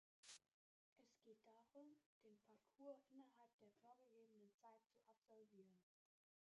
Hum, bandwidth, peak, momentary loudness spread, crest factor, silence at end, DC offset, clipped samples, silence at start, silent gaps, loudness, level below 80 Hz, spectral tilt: none; 7 kHz; -50 dBFS; 6 LU; 22 dB; 0.65 s; under 0.1%; under 0.1%; 0.25 s; 0.54-0.96 s, 2.06-2.21 s, 3.53-3.59 s, 4.54-4.59 s, 5.18-5.22 s; -66 LUFS; under -90 dBFS; -3.5 dB/octave